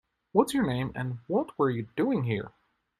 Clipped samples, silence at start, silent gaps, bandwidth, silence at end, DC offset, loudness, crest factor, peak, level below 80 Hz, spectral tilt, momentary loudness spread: under 0.1%; 0.35 s; none; 15 kHz; 0.5 s; under 0.1%; -29 LUFS; 22 dB; -8 dBFS; -60 dBFS; -7 dB/octave; 8 LU